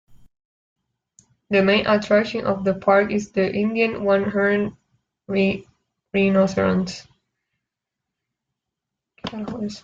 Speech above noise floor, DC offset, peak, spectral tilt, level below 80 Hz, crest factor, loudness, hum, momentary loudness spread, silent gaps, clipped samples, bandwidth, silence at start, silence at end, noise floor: 64 dB; under 0.1%; -6 dBFS; -6.5 dB/octave; -56 dBFS; 18 dB; -21 LUFS; none; 12 LU; 0.45-0.76 s; under 0.1%; 7.6 kHz; 0.1 s; 0.05 s; -84 dBFS